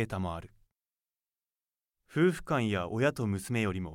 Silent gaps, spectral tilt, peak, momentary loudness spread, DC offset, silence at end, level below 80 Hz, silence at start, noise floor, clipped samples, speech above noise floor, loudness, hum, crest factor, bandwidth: none; -6.5 dB/octave; -14 dBFS; 9 LU; under 0.1%; 0 s; -58 dBFS; 0 s; under -90 dBFS; under 0.1%; over 59 dB; -31 LUFS; none; 18 dB; 16.5 kHz